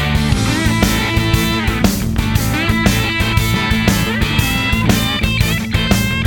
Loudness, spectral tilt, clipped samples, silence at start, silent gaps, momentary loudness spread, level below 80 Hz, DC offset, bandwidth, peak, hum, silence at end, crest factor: -15 LUFS; -4.5 dB/octave; under 0.1%; 0 s; none; 2 LU; -22 dBFS; under 0.1%; 19.5 kHz; 0 dBFS; none; 0 s; 14 dB